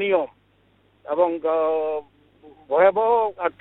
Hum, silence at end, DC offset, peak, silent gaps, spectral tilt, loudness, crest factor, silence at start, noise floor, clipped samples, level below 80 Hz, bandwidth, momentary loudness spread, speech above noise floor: 50 Hz at -65 dBFS; 0.1 s; under 0.1%; -4 dBFS; none; -8.5 dB/octave; -21 LUFS; 18 dB; 0 s; -61 dBFS; under 0.1%; -66 dBFS; 4.1 kHz; 11 LU; 40 dB